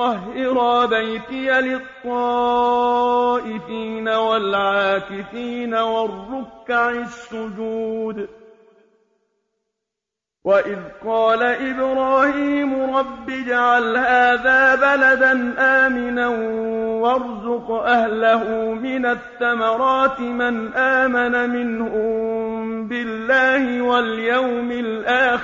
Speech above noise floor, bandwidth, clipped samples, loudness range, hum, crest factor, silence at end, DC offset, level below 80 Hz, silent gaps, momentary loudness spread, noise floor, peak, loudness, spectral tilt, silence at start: 66 dB; 7.6 kHz; under 0.1%; 10 LU; none; 16 dB; 0 s; under 0.1%; -54 dBFS; none; 12 LU; -85 dBFS; -4 dBFS; -19 LUFS; -5 dB/octave; 0 s